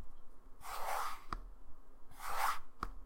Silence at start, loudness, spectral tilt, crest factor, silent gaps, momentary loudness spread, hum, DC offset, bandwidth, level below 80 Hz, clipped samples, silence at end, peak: 0 s; -42 LUFS; -2 dB/octave; 18 dB; none; 22 LU; none; under 0.1%; 16.5 kHz; -52 dBFS; under 0.1%; 0 s; -22 dBFS